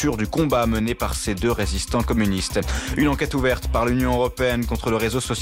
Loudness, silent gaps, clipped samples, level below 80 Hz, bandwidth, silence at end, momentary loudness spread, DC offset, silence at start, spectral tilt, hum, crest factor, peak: -22 LUFS; none; under 0.1%; -30 dBFS; 16 kHz; 0 s; 3 LU; under 0.1%; 0 s; -5 dB/octave; none; 12 dB; -10 dBFS